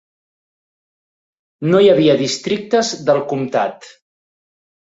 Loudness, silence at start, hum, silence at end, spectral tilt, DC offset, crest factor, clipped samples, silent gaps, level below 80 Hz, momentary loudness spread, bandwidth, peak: -16 LUFS; 1.6 s; none; 1.05 s; -5 dB/octave; under 0.1%; 16 dB; under 0.1%; none; -60 dBFS; 9 LU; 8 kHz; -2 dBFS